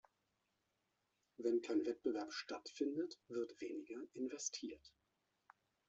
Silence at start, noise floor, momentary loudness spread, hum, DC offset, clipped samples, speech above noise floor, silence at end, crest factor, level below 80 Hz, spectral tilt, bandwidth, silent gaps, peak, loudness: 1.4 s; -86 dBFS; 10 LU; none; under 0.1%; under 0.1%; 43 dB; 1 s; 18 dB; -86 dBFS; -3 dB/octave; 8 kHz; none; -28 dBFS; -44 LUFS